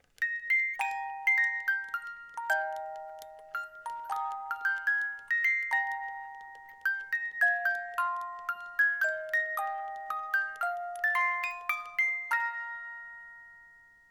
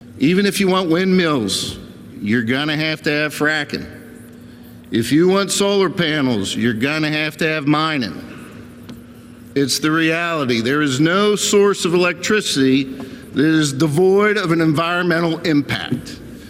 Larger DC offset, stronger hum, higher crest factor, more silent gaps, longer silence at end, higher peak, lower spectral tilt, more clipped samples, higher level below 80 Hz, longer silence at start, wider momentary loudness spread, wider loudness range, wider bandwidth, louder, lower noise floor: neither; neither; about the same, 18 dB vs 14 dB; neither; first, 0.3 s vs 0 s; second, -16 dBFS vs -4 dBFS; second, 1 dB/octave vs -4.5 dB/octave; neither; second, -78 dBFS vs -52 dBFS; first, 0.2 s vs 0 s; about the same, 15 LU vs 13 LU; about the same, 2 LU vs 4 LU; first, 18.5 kHz vs 16 kHz; second, -30 LUFS vs -17 LUFS; first, -58 dBFS vs -39 dBFS